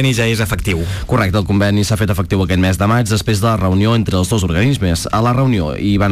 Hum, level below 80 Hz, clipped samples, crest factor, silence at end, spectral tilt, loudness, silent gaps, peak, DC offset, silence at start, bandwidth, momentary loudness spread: none; -30 dBFS; under 0.1%; 8 dB; 0 s; -6 dB/octave; -15 LUFS; none; -6 dBFS; under 0.1%; 0 s; 15.5 kHz; 3 LU